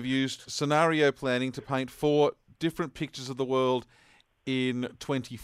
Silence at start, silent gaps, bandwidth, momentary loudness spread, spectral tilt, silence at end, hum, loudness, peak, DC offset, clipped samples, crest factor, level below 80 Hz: 0 s; none; 15 kHz; 10 LU; -5 dB/octave; 0 s; none; -29 LUFS; -12 dBFS; under 0.1%; under 0.1%; 18 dB; -64 dBFS